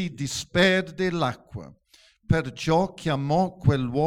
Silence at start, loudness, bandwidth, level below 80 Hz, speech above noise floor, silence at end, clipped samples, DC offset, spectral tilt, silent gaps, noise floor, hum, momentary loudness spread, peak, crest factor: 0 s; -24 LUFS; 14.5 kHz; -46 dBFS; 25 dB; 0 s; under 0.1%; under 0.1%; -5.5 dB/octave; none; -49 dBFS; none; 10 LU; -6 dBFS; 18 dB